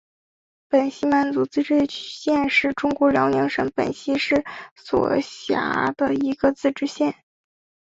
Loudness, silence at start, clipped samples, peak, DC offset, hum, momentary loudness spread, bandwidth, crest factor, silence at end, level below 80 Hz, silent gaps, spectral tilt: -22 LUFS; 0.7 s; under 0.1%; -4 dBFS; under 0.1%; none; 7 LU; 7.8 kHz; 18 dB; 0.7 s; -56 dBFS; 4.71-4.76 s; -5.5 dB/octave